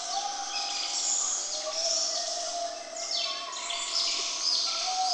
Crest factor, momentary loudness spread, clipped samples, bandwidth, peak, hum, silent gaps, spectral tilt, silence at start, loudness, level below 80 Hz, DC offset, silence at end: 16 dB; 7 LU; under 0.1%; 12 kHz; -14 dBFS; none; none; 3 dB/octave; 0 s; -28 LUFS; -72 dBFS; under 0.1%; 0 s